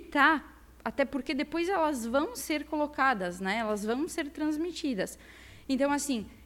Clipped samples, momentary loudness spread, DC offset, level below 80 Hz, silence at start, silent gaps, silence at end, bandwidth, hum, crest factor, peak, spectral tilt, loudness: under 0.1%; 8 LU; under 0.1%; -56 dBFS; 0 s; none; 0 s; 16.5 kHz; none; 20 dB; -10 dBFS; -3.5 dB/octave; -30 LUFS